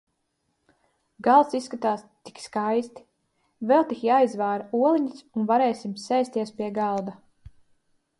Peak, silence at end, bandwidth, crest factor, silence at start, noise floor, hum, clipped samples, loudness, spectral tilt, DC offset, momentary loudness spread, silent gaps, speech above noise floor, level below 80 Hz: -6 dBFS; 1.05 s; 11.5 kHz; 20 dB; 1.2 s; -75 dBFS; none; under 0.1%; -24 LUFS; -6 dB/octave; under 0.1%; 13 LU; none; 51 dB; -66 dBFS